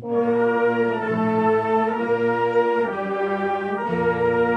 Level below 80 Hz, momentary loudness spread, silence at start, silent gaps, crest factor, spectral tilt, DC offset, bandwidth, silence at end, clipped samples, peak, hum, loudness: -64 dBFS; 4 LU; 0 s; none; 12 dB; -8 dB/octave; under 0.1%; 6 kHz; 0 s; under 0.1%; -8 dBFS; none; -21 LUFS